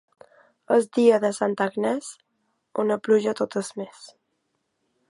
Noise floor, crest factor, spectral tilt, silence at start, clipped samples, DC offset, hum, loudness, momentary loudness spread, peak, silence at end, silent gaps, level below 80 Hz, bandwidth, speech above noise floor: -75 dBFS; 20 dB; -5 dB/octave; 0.7 s; under 0.1%; under 0.1%; none; -23 LUFS; 15 LU; -6 dBFS; 1.05 s; none; -78 dBFS; 11.5 kHz; 52 dB